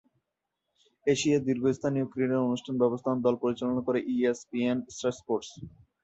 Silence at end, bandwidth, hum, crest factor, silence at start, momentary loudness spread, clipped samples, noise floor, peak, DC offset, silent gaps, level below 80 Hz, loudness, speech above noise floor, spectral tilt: 0.35 s; 8.2 kHz; none; 18 dB; 1.05 s; 7 LU; under 0.1%; -84 dBFS; -12 dBFS; under 0.1%; none; -66 dBFS; -29 LUFS; 56 dB; -6 dB/octave